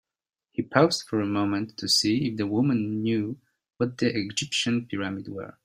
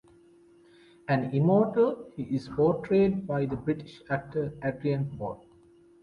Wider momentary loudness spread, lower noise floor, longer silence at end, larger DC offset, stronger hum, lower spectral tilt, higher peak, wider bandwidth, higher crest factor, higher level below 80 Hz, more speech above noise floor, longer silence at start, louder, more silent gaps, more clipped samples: about the same, 12 LU vs 13 LU; first, -86 dBFS vs -58 dBFS; second, 0.15 s vs 0.65 s; neither; neither; second, -4.5 dB/octave vs -9.5 dB/octave; first, -4 dBFS vs -12 dBFS; first, 15.5 kHz vs 10 kHz; first, 24 dB vs 16 dB; second, -64 dBFS vs -58 dBFS; first, 60 dB vs 30 dB; second, 0.6 s vs 1.1 s; about the same, -26 LUFS vs -28 LUFS; neither; neither